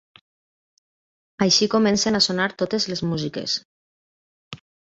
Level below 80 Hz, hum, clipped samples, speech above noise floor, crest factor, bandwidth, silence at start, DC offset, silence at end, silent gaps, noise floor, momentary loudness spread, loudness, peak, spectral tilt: -58 dBFS; none; under 0.1%; over 69 dB; 20 dB; 7.8 kHz; 1.4 s; under 0.1%; 0.3 s; 3.65-4.51 s; under -90 dBFS; 14 LU; -21 LUFS; -6 dBFS; -3.5 dB/octave